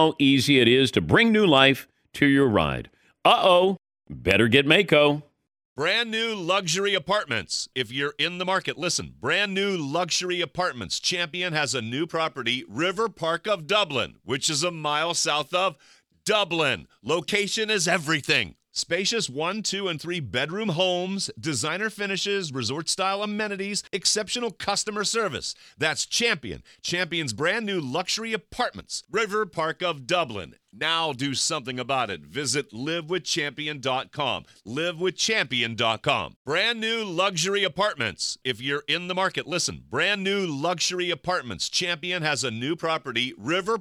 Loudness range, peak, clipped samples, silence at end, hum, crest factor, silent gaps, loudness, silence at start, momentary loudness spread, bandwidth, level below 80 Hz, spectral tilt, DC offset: 6 LU; -4 dBFS; under 0.1%; 0 s; none; 22 dB; 5.65-5.76 s, 36.36-36.45 s; -24 LUFS; 0 s; 10 LU; 16 kHz; -56 dBFS; -3 dB/octave; under 0.1%